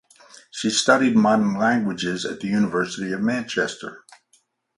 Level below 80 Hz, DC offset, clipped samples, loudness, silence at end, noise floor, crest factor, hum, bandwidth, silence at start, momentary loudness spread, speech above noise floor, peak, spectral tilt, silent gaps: -62 dBFS; under 0.1%; under 0.1%; -21 LUFS; 0.8 s; -64 dBFS; 20 dB; none; 11.5 kHz; 0.55 s; 10 LU; 43 dB; -2 dBFS; -4.5 dB/octave; none